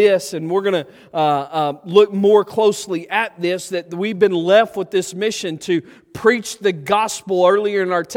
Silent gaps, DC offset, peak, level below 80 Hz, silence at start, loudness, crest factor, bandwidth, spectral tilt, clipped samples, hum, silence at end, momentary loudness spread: none; under 0.1%; 0 dBFS; -64 dBFS; 0 s; -18 LUFS; 18 dB; 16 kHz; -4.5 dB/octave; under 0.1%; none; 0 s; 9 LU